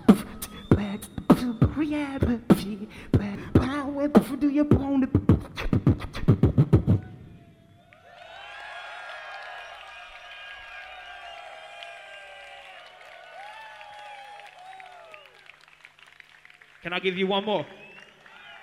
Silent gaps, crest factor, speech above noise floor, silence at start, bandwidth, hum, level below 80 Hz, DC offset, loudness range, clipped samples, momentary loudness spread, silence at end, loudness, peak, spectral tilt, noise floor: none; 26 dB; 31 dB; 0 s; 16 kHz; none; -42 dBFS; under 0.1%; 20 LU; under 0.1%; 23 LU; 0.05 s; -24 LUFS; -2 dBFS; -7.5 dB/octave; -55 dBFS